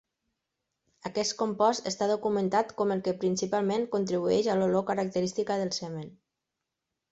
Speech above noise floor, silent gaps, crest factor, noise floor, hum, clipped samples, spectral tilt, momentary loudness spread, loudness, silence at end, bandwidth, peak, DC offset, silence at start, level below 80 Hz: 58 dB; none; 18 dB; -86 dBFS; none; under 0.1%; -5 dB/octave; 8 LU; -29 LUFS; 1 s; 8 kHz; -12 dBFS; under 0.1%; 1.05 s; -70 dBFS